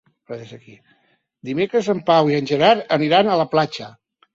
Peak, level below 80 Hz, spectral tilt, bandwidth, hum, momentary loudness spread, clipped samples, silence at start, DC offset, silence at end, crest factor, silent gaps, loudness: -2 dBFS; -62 dBFS; -6 dB/octave; 7.6 kHz; none; 19 LU; under 0.1%; 0.3 s; under 0.1%; 0.45 s; 18 dB; none; -18 LUFS